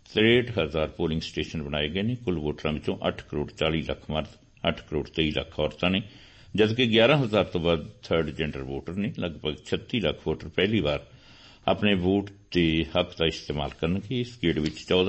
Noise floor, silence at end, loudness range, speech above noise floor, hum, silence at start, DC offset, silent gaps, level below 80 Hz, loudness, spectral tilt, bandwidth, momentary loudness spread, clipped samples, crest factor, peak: -51 dBFS; 0 s; 5 LU; 25 dB; none; 0.1 s; under 0.1%; none; -46 dBFS; -27 LUFS; -6.5 dB/octave; 8.4 kHz; 11 LU; under 0.1%; 18 dB; -8 dBFS